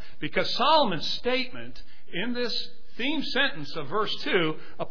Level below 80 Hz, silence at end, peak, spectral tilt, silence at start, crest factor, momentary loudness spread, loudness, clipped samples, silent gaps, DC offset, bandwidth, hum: -56 dBFS; 0 s; -8 dBFS; -4.5 dB/octave; 0 s; 20 dB; 15 LU; -27 LUFS; under 0.1%; none; 4%; 5.4 kHz; none